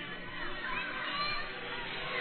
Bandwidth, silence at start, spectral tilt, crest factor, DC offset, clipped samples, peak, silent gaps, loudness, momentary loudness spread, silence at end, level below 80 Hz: 4.5 kHz; 0 s; -6 dB/octave; 14 dB; 0.2%; under 0.1%; -24 dBFS; none; -36 LUFS; 6 LU; 0 s; -50 dBFS